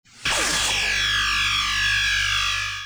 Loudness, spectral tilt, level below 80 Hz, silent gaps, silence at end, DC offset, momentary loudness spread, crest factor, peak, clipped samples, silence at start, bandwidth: -20 LUFS; 0 dB/octave; -40 dBFS; none; 0 s; under 0.1%; 2 LU; 12 dB; -10 dBFS; under 0.1%; 0.15 s; over 20 kHz